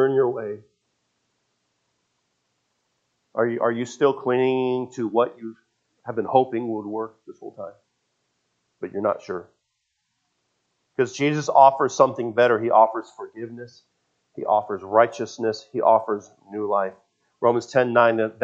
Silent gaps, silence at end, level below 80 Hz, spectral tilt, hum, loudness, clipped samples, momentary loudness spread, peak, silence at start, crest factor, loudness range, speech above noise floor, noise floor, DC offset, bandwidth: none; 0 s; -78 dBFS; -5.5 dB/octave; none; -22 LUFS; under 0.1%; 20 LU; 0 dBFS; 0 s; 22 dB; 13 LU; 54 dB; -76 dBFS; under 0.1%; 7.8 kHz